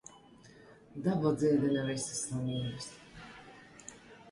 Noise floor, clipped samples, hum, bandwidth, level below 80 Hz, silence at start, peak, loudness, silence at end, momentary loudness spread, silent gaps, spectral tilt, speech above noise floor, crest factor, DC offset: -57 dBFS; under 0.1%; none; 11.5 kHz; -64 dBFS; 0.1 s; -16 dBFS; -33 LUFS; 0 s; 23 LU; none; -5.5 dB/octave; 25 dB; 18 dB; under 0.1%